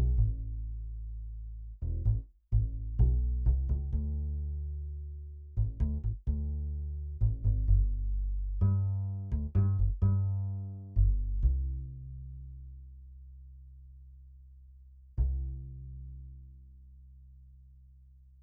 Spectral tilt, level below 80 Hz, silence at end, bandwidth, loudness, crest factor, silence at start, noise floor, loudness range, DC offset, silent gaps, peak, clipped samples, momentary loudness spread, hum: -13.5 dB/octave; -34 dBFS; 0.7 s; 1.6 kHz; -34 LUFS; 18 dB; 0 s; -56 dBFS; 11 LU; under 0.1%; none; -14 dBFS; under 0.1%; 21 LU; none